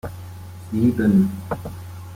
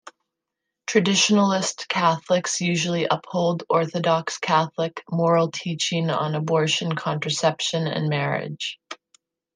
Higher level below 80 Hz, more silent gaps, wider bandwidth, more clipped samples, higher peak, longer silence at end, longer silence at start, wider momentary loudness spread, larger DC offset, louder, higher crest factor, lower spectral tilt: first, -48 dBFS vs -70 dBFS; neither; first, 16 kHz vs 10 kHz; neither; about the same, -6 dBFS vs -4 dBFS; second, 0 s vs 0.6 s; second, 0.05 s vs 0.9 s; first, 20 LU vs 8 LU; neither; about the same, -21 LUFS vs -22 LUFS; about the same, 16 dB vs 20 dB; first, -8.5 dB/octave vs -4 dB/octave